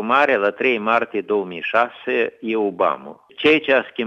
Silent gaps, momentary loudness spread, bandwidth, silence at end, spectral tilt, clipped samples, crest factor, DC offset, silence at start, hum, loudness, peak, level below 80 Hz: none; 6 LU; 7.6 kHz; 0 s; -6 dB/octave; under 0.1%; 18 dB; under 0.1%; 0 s; none; -19 LUFS; -2 dBFS; -66 dBFS